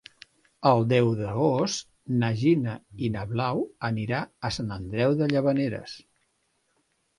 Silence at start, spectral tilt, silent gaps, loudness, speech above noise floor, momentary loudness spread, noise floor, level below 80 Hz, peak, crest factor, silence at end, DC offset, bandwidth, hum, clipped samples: 0.6 s; -6.5 dB/octave; none; -26 LUFS; 47 dB; 9 LU; -72 dBFS; -56 dBFS; -6 dBFS; 20 dB; 1.2 s; under 0.1%; 11.5 kHz; none; under 0.1%